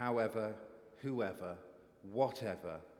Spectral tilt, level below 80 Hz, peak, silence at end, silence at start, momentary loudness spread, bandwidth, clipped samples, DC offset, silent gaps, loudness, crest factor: -7 dB/octave; -74 dBFS; -20 dBFS; 0.05 s; 0 s; 18 LU; 16.5 kHz; under 0.1%; under 0.1%; none; -40 LUFS; 20 dB